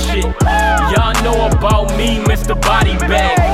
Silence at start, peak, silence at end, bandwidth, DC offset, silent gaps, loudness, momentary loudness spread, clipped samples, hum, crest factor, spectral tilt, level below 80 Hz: 0 s; 0 dBFS; 0 s; 15.5 kHz; under 0.1%; none; -13 LUFS; 3 LU; under 0.1%; none; 12 dB; -5 dB/octave; -16 dBFS